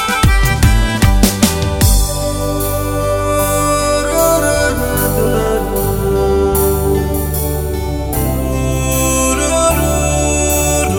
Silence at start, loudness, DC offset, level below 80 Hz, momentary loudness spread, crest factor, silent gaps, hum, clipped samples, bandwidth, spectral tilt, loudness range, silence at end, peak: 0 s; -14 LUFS; under 0.1%; -18 dBFS; 5 LU; 14 dB; none; none; under 0.1%; 17 kHz; -4.5 dB/octave; 2 LU; 0 s; 0 dBFS